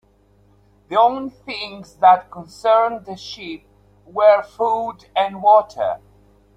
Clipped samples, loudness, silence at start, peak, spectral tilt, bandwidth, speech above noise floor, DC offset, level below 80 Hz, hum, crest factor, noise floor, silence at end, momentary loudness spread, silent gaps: under 0.1%; -18 LUFS; 0.9 s; -2 dBFS; -4.5 dB/octave; 9.2 kHz; 38 dB; under 0.1%; -58 dBFS; none; 18 dB; -55 dBFS; 0.6 s; 18 LU; none